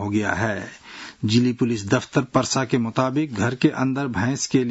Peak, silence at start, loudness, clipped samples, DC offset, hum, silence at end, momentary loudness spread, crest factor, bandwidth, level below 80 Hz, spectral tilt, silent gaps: -4 dBFS; 0 s; -22 LUFS; under 0.1%; under 0.1%; none; 0 s; 8 LU; 18 dB; 8 kHz; -58 dBFS; -5 dB/octave; none